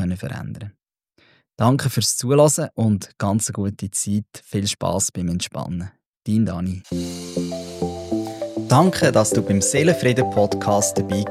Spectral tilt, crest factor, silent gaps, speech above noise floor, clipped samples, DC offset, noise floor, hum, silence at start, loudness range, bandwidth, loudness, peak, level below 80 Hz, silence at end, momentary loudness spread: -5 dB/octave; 20 dB; 6.06-6.14 s; 40 dB; under 0.1%; under 0.1%; -60 dBFS; none; 0 s; 6 LU; 16 kHz; -20 LUFS; -2 dBFS; -52 dBFS; 0 s; 12 LU